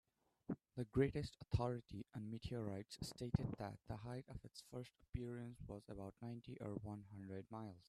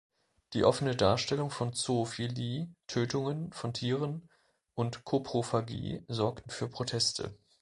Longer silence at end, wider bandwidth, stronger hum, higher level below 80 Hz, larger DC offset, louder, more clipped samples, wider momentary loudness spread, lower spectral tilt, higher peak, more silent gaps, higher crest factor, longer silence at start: second, 0.1 s vs 0.25 s; first, 13.5 kHz vs 11.5 kHz; neither; about the same, -62 dBFS vs -60 dBFS; neither; second, -48 LUFS vs -33 LUFS; neither; about the same, 12 LU vs 11 LU; first, -7 dB/octave vs -5 dB/octave; second, -24 dBFS vs -10 dBFS; neither; about the same, 24 dB vs 22 dB; about the same, 0.5 s vs 0.5 s